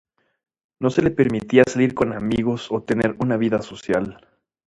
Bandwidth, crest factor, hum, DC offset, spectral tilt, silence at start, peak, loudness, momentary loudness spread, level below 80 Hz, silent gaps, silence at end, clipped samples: 10.5 kHz; 20 dB; none; under 0.1%; -6.5 dB/octave; 0.8 s; 0 dBFS; -21 LUFS; 8 LU; -50 dBFS; none; 0.55 s; under 0.1%